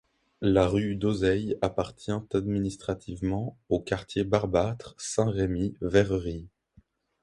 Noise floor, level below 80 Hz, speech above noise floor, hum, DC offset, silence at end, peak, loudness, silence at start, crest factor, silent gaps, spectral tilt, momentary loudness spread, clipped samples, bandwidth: -62 dBFS; -46 dBFS; 35 dB; none; under 0.1%; 0.75 s; -6 dBFS; -28 LUFS; 0.4 s; 22 dB; none; -6.5 dB/octave; 9 LU; under 0.1%; 11.5 kHz